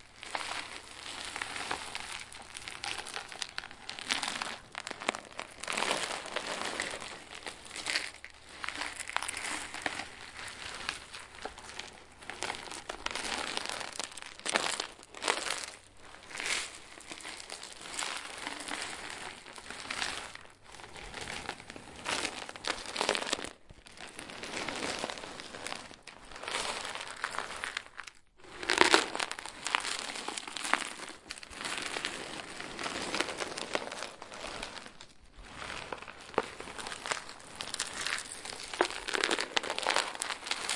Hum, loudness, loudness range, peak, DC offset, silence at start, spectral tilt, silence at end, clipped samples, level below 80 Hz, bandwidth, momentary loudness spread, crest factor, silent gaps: none; -36 LUFS; 8 LU; 0 dBFS; under 0.1%; 0 s; -1 dB/octave; 0 s; under 0.1%; -64 dBFS; 11.5 kHz; 13 LU; 38 dB; none